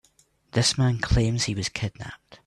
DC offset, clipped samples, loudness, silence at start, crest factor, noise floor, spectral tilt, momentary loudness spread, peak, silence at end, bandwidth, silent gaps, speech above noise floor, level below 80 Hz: under 0.1%; under 0.1%; -24 LUFS; 0.55 s; 18 dB; -63 dBFS; -4.5 dB/octave; 13 LU; -8 dBFS; 0.1 s; 12 kHz; none; 38 dB; -36 dBFS